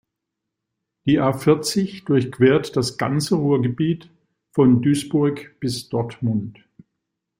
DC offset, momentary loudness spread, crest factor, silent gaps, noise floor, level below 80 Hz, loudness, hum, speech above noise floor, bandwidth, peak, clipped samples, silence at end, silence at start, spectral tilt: under 0.1%; 10 LU; 18 dB; none; -82 dBFS; -56 dBFS; -20 LUFS; none; 62 dB; 16.5 kHz; -4 dBFS; under 0.1%; 0.9 s; 1.05 s; -6.5 dB/octave